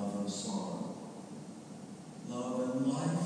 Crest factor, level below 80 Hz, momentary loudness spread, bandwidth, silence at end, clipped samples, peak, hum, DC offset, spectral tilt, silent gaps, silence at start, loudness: 16 dB; -80 dBFS; 15 LU; 11 kHz; 0 s; under 0.1%; -22 dBFS; none; under 0.1%; -6 dB/octave; none; 0 s; -38 LUFS